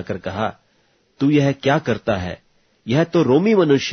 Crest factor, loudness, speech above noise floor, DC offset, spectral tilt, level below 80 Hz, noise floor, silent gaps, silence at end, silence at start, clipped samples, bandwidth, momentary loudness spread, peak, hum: 16 dB; -18 LUFS; 43 dB; under 0.1%; -6.5 dB/octave; -52 dBFS; -61 dBFS; none; 0 s; 0 s; under 0.1%; 6.6 kHz; 12 LU; -2 dBFS; none